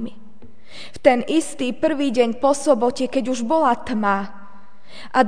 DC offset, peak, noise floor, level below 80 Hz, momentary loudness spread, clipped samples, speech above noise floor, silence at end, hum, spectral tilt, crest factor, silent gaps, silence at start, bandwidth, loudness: 3%; 0 dBFS; -48 dBFS; -56 dBFS; 17 LU; under 0.1%; 28 dB; 0 s; none; -4.5 dB/octave; 20 dB; none; 0 s; 10 kHz; -20 LUFS